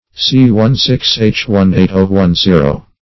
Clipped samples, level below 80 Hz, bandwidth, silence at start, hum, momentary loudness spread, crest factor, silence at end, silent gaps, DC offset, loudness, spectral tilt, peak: 0.3%; -30 dBFS; 6 kHz; 0.15 s; none; 3 LU; 10 dB; 0.2 s; none; 1%; -10 LUFS; -6.5 dB/octave; 0 dBFS